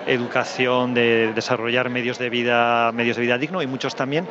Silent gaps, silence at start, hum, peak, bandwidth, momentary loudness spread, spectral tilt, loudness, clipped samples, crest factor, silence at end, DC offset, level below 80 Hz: none; 0 s; none; -4 dBFS; 8 kHz; 6 LU; -5 dB/octave; -20 LUFS; under 0.1%; 16 dB; 0 s; under 0.1%; -68 dBFS